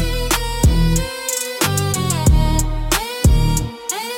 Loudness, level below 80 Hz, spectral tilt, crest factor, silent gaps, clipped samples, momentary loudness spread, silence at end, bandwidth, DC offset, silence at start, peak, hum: -18 LUFS; -20 dBFS; -4 dB/octave; 14 dB; none; under 0.1%; 6 LU; 0 s; 17 kHz; under 0.1%; 0 s; -2 dBFS; none